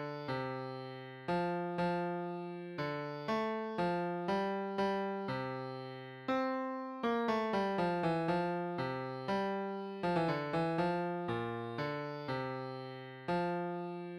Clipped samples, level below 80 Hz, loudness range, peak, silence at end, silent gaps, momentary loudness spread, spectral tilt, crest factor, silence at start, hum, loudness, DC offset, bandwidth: under 0.1%; -70 dBFS; 3 LU; -22 dBFS; 0 s; none; 9 LU; -7.5 dB/octave; 14 dB; 0 s; none; -37 LUFS; under 0.1%; 11.5 kHz